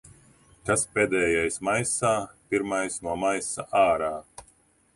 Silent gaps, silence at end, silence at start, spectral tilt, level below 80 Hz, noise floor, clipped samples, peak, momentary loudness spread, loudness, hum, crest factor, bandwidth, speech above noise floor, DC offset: none; 0.55 s; 0.65 s; -3.5 dB/octave; -54 dBFS; -62 dBFS; under 0.1%; -10 dBFS; 7 LU; -25 LUFS; none; 18 dB; 11.5 kHz; 36 dB; under 0.1%